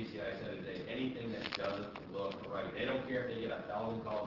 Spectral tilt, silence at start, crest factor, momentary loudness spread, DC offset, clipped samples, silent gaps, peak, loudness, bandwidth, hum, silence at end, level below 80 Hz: -4 dB/octave; 0 s; 18 dB; 6 LU; under 0.1%; under 0.1%; none; -22 dBFS; -40 LUFS; 6 kHz; none; 0 s; -66 dBFS